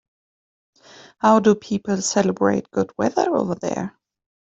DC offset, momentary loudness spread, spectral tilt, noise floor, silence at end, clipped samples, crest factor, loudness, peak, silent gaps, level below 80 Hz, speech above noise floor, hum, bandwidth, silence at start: under 0.1%; 10 LU; -5 dB/octave; under -90 dBFS; 0.65 s; under 0.1%; 18 dB; -20 LUFS; -2 dBFS; none; -60 dBFS; over 70 dB; none; 8.2 kHz; 1.25 s